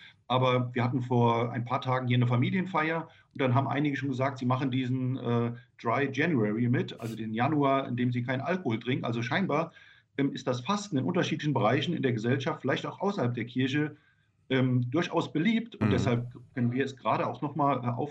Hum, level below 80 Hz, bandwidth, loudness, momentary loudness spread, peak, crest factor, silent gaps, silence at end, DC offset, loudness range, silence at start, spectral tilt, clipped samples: none; -68 dBFS; 8 kHz; -29 LUFS; 5 LU; -12 dBFS; 16 dB; none; 0 s; under 0.1%; 2 LU; 0 s; -7 dB/octave; under 0.1%